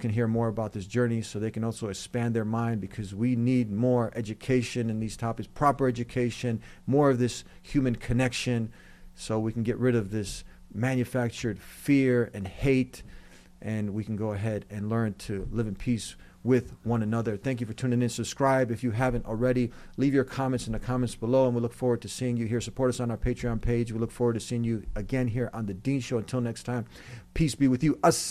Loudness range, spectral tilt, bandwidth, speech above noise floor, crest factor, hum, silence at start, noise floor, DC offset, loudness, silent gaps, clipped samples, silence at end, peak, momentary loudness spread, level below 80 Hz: 3 LU; -6.5 dB/octave; 14.5 kHz; 21 dB; 18 dB; none; 0 s; -49 dBFS; under 0.1%; -29 LUFS; none; under 0.1%; 0 s; -10 dBFS; 9 LU; -46 dBFS